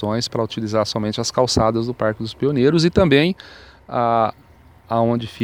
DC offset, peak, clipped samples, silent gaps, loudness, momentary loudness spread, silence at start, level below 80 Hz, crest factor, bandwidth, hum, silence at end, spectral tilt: under 0.1%; 0 dBFS; under 0.1%; none; -19 LUFS; 8 LU; 0 s; -44 dBFS; 18 dB; 19.5 kHz; none; 0 s; -5.5 dB/octave